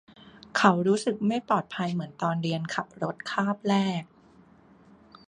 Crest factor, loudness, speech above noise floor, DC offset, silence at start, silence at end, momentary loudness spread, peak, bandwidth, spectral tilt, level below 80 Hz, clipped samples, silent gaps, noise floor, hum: 24 dB; -27 LUFS; 30 dB; under 0.1%; 0.55 s; 1.25 s; 10 LU; -6 dBFS; 10.5 kHz; -6 dB/octave; -68 dBFS; under 0.1%; none; -56 dBFS; none